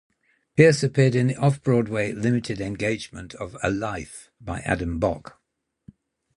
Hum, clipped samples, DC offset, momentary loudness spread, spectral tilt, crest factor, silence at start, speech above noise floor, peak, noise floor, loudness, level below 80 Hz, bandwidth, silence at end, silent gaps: none; under 0.1%; under 0.1%; 18 LU; -6.5 dB/octave; 22 dB; 0.55 s; 55 dB; -2 dBFS; -78 dBFS; -23 LUFS; -46 dBFS; 11.5 kHz; 1.2 s; none